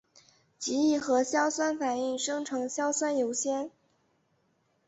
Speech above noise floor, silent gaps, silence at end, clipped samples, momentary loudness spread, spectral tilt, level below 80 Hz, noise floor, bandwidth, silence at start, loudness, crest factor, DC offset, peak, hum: 43 dB; none; 1.2 s; under 0.1%; 6 LU; -2 dB/octave; -76 dBFS; -72 dBFS; 8.2 kHz; 0.6 s; -29 LUFS; 16 dB; under 0.1%; -14 dBFS; none